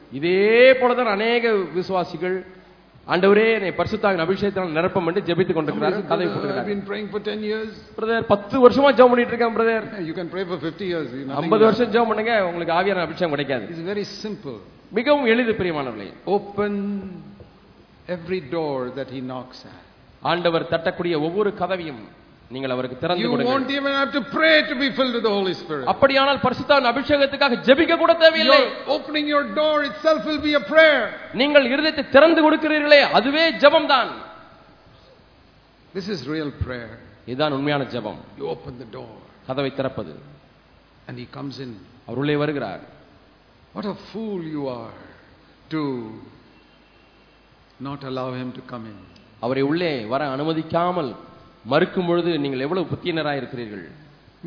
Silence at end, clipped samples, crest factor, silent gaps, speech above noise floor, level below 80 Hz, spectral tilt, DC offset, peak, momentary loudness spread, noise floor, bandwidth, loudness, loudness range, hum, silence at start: 0 s; under 0.1%; 22 dB; none; 33 dB; -54 dBFS; -6.5 dB/octave; under 0.1%; 0 dBFS; 19 LU; -53 dBFS; 5.4 kHz; -20 LUFS; 14 LU; none; 0.1 s